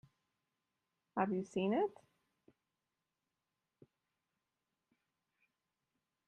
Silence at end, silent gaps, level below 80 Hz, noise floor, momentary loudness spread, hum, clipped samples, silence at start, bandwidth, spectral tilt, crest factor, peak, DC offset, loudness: 4.35 s; none; -84 dBFS; -90 dBFS; 5 LU; none; under 0.1%; 1.15 s; 9.2 kHz; -7 dB/octave; 24 dB; -20 dBFS; under 0.1%; -38 LUFS